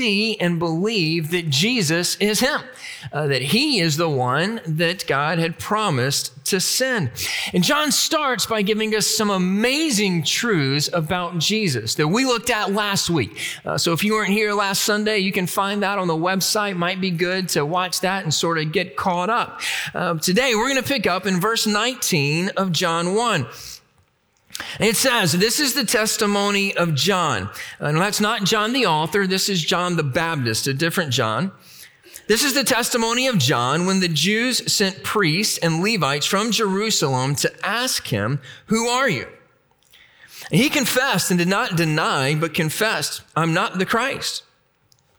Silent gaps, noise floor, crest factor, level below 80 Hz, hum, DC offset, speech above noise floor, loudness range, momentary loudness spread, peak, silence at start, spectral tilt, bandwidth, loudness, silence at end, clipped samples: none; -62 dBFS; 16 dB; -58 dBFS; none; under 0.1%; 42 dB; 3 LU; 5 LU; -4 dBFS; 0 s; -3.5 dB/octave; over 20 kHz; -19 LUFS; 0.8 s; under 0.1%